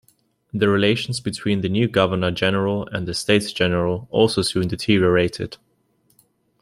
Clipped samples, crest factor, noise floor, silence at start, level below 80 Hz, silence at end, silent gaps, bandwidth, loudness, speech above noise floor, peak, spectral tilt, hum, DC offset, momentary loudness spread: under 0.1%; 18 dB; -63 dBFS; 0.55 s; -52 dBFS; 1.05 s; none; 15.5 kHz; -20 LUFS; 44 dB; -2 dBFS; -5.5 dB/octave; none; under 0.1%; 8 LU